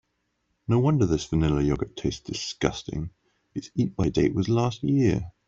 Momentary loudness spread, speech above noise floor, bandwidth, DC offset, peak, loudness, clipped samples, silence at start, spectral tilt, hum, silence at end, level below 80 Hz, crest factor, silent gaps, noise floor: 12 LU; 50 dB; 7.8 kHz; under 0.1%; -6 dBFS; -25 LUFS; under 0.1%; 0.7 s; -6.5 dB/octave; none; 0.2 s; -44 dBFS; 20 dB; none; -75 dBFS